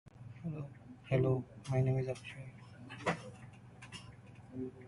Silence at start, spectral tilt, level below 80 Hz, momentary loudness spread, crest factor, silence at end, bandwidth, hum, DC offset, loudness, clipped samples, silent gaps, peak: 0.05 s; -7.5 dB/octave; -64 dBFS; 21 LU; 20 dB; 0 s; 11.5 kHz; none; under 0.1%; -38 LUFS; under 0.1%; none; -20 dBFS